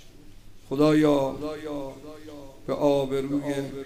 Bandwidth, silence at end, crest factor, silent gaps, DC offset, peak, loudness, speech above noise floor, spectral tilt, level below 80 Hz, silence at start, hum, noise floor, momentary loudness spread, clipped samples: 15.5 kHz; 0 s; 18 dB; none; under 0.1%; -8 dBFS; -25 LUFS; 20 dB; -7 dB/octave; -48 dBFS; 0.05 s; none; -45 dBFS; 22 LU; under 0.1%